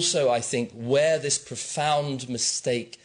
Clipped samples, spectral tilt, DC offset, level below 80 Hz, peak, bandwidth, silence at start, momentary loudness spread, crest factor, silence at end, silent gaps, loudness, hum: under 0.1%; -3 dB/octave; under 0.1%; -68 dBFS; -12 dBFS; 10.5 kHz; 0 s; 7 LU; 14 dB; 0.15 s; none; -25 LUFS; none